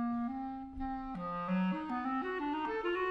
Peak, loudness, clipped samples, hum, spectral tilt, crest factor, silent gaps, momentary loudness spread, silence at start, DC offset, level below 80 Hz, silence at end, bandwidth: -24 dBFS; -37 LUFS; under 0.1%; none; -8.5 dB/octave; 12 dB; none; 7 LU; 0 s; under 0.1%; -56 dBFS; 0 s; 6 kHz